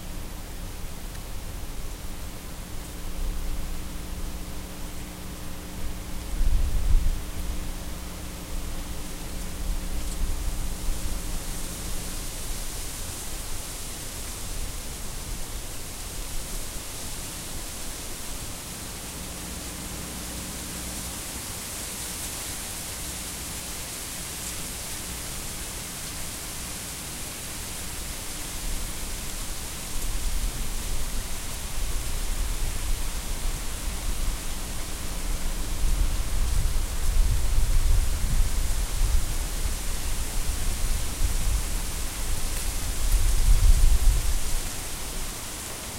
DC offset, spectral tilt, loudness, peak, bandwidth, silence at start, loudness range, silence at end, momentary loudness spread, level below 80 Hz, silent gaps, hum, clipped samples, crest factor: under 0.1%; -3 dB/octave; -32 LUFS; -8 dBFS; 16 kHz; 0 s; 7 LU; 0 s; 9 LU; -28 dBFS; none; none; under 0.1%; 20 dB